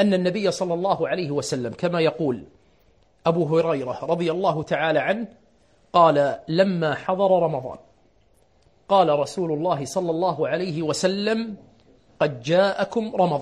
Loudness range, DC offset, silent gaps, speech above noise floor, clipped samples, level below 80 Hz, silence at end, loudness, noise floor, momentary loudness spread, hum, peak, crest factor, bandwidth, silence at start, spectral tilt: 3 LU; under 0.1%; none; 39 dB; under 0.1%; -62 dBFS; 0 s; -23 LUFS; -61 dBFS; 8 LU; none; -4 dBFS; 20 dB; 11 kHz; 0 s; -5.5 dB/octave